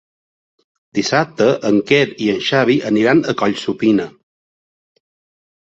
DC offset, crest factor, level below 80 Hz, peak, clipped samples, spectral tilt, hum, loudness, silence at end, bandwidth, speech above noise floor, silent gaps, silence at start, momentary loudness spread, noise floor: under 0.1%; 16 dB; -58 dBFS; -2 dBFS; under 0.1%; -5.5 dB/octave; none; -16 LUFS; 1.55 s; 8 kHz; over 75 dB; none; 0.95 s; 5 LU; under -90 dBFS